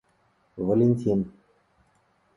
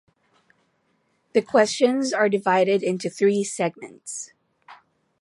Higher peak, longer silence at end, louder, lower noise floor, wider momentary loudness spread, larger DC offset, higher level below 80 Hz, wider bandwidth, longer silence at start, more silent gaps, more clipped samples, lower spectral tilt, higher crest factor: second, -10 dBFS vs -4 dBFS; first, 1.05 s vs 0.45 s; second, -25 LUFS vs -22 LUFS; about the same, -67 dBFS vs -68 dBFS; about the same, 15 LU vs 14 LU; neither; first, -58 dBFS vs -76 dBFS; about the same, 10.5 kHz vs 11.5 kHz; second, 0.55 s vs 1.35 s; neither; neither; first, -11 dB/octave vs -4.5 dB/octave; about the same, 18 dB vs 18 dB